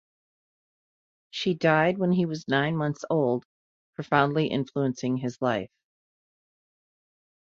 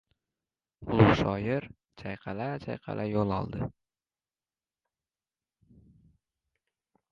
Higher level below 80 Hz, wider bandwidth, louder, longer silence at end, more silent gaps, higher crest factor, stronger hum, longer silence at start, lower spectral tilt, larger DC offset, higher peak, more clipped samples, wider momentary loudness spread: second, -68 dBFS vs -52 dBFS; about the same, 7.6 kHz vs 7 kHz; first, -26 LUFS vs -30 LUFS; second, 1.9 s vs 3.4 s; first, 3.45-3.93 s vs none; about the same, 22 dB vs 26 dB; neither; first, 1.35 s vs 0.8 s; second, -6.5 dB/octave vs -8 dB/octave; neither; about the same, -6 dBFS vs -6 dBFS; neither; second, 10 LU vs 18 LU